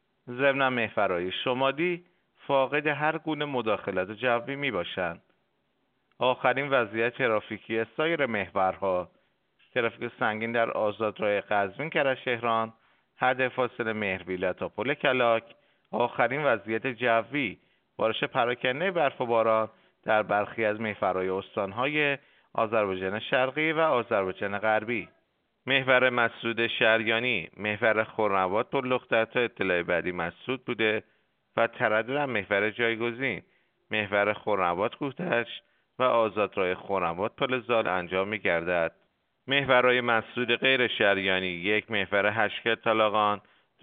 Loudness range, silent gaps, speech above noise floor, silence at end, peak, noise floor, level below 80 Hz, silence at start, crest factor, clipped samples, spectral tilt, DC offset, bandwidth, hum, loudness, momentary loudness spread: 4 LU; none; 47 dB; 0.45 s; -6 dBFS; -74 dBFS; -70 dBFS; 0.25 s; 22 dB; under 0.1%; -2.5 dB/octave; under 0.1%; 4.6 kHz; none; -27 LUFS; 8 LU